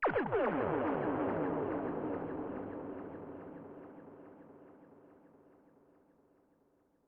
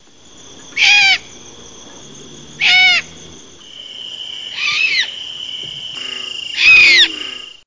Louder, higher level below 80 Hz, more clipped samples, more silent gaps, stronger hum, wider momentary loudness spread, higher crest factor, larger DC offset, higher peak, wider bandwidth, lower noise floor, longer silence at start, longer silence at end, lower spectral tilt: second, -37 LUFS vs -10 LUFS; second, -68 dBFS vs -52 dBFS; neither; neither; neither; first, 22 LU vs 19 LU; about the same, 18 dB vs 16 dB; neither; second, -22 dBFS vs 0 dBFS; second, 5 kHz vs 7.6 kHz; first, -73 dBFS vs -42 dBFS; second, 0 s vs 0.45 s; first, 1.9 s vs 0.15 s; first, -6.5 dB/octave vs 1 dB/octave